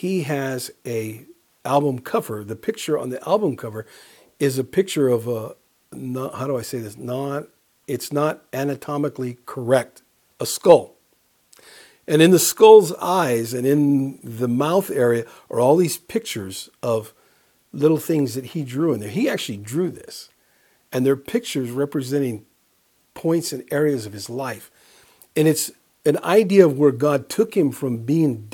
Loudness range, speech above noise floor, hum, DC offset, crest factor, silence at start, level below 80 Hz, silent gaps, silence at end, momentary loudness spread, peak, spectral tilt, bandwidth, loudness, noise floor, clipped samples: 9 LU; 43 dB; none; under 0.1%; 20 dB; 0 s; -68 dBFS; none; 0.05 s; 15 LU; 0 dBFS; -5.5 dB/octave; 19 kHz; -21 LUFS; -63 dBFS; under 0.1%